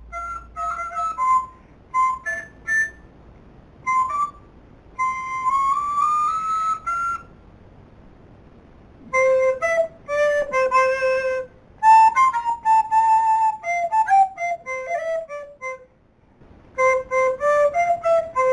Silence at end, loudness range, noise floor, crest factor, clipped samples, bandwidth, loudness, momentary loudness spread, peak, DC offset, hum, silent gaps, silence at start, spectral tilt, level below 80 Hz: 0 s; 7 LU; -56 dBFS; 16 dB; under 0.1%; 10.5 kHz; -20 LUFS; 12 LU; -4 dBFS; under 0.1%; none; none; 0 s; -3 dB/octave; -52 dBFS